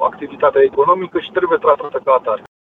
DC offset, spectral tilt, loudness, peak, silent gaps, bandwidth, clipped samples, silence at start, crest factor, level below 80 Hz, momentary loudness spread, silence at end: under 0.1%; -7.5 dB/octave; -16 LUFS; -2 dBFS; none; 4 kHz; under 0.1%; 0 s; 14 dB; -56 dBFS; 7 LU; 0.3 s